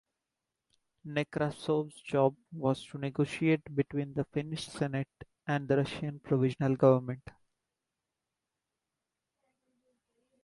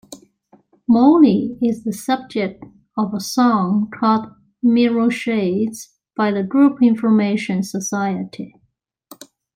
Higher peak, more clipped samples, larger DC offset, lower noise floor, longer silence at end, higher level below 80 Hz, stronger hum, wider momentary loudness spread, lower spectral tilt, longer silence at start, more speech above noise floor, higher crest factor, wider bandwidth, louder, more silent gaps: second, -12 dBFS vs -2 dBFS; neither; neither; first, -88 dBFS vs -66 dBFS; first, 3.25 s vs 1.1 s; second, -66 dBFS vs -60 dBFS; neither; about the same, 12 LU vs 14 LU; first, -7.5 dB/octave vs -6 dB/octave; first, 1.05 s vs 0.1 s; first, 57 dB vs 49 dB; first, 22 dB vs 16 dB; second, 11.5 kHz vs 16 kHz; second, -32 LUFS vs -18 LUFS; neither